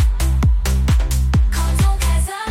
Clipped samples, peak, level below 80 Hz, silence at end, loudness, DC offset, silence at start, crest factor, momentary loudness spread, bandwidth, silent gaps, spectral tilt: under 0.1%; -8 dBFS; -16 dBFS; 0 s; -18 LUFS; under 0.1%; 0 s; 8 dB; 2 LU; 16 kHz; none; -5 dB/octave